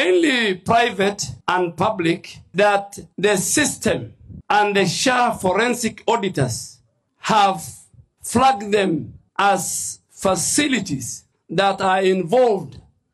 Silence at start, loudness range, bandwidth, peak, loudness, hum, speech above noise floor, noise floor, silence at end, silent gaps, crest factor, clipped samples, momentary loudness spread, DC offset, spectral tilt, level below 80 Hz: 0 s; 2 LU; 13 kHz; -6 dBFS; -19 LUFS; none; 23 dB; -42 dBFS; 0.35 s; none; 14 dB; under 0.1%; 12 LU; under 0.1%; -3.5 dB/octave; -52 dBFS